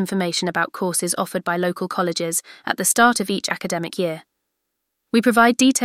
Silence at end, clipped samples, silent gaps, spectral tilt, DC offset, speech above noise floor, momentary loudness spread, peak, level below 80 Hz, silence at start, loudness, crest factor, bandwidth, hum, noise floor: 0 s; under 0.1%; none; -3.5 dB/octave; under 0.1%; 57 dB; 10 LU; -2 dBFS; -66 dBFS; 0 s; -20 LUFS; 18 dB; 16 kHz; none; -77 dBFS